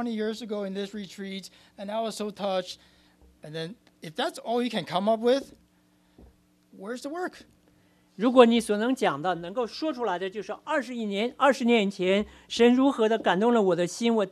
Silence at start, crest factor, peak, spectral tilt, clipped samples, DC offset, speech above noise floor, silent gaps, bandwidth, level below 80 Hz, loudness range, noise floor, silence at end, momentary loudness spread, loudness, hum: 0 s; 24 dB; -4 dBFS; -5 dB/octave; under 0.1%; under 0.1%; 38 dB; none; 13.5 kHz; -66 dBFS; 10 LU; -64 dBFS; 0 s; 16 LU; -26 LUFS; none